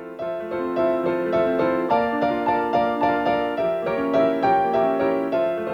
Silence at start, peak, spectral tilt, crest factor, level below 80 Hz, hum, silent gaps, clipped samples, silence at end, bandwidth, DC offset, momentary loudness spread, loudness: 0 s; -8 dBFS; -7.5 dB/octave; 14 dB; -54 dBFS; none; none; under 0.1%; 0 s; 7 kHz; under 0.1%; 4 LU; -22 LUFS